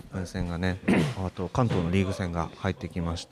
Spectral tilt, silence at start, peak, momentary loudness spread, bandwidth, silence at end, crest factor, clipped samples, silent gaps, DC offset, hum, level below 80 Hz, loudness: -6.5 dB/octave; 0.05 s; -10 dBFS; 8 LU; 13 kHz; 0.05 s; 18 dB; under 0.1%; none; under 0.1%; none; -44 dBFS; -29 LUFS